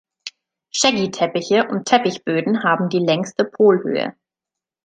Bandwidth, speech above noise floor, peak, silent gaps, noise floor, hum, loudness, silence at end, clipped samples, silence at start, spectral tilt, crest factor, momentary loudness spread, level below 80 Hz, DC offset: 9.4 kHz; 69 dB; -2 dBFS; none; -87 dBFS; none; -18 LUFS; 0.75 s; under 0.1%; 0.25 s; -4 dB/octave; 18 dB; 12 LU; -66 dBFS; under 0.1%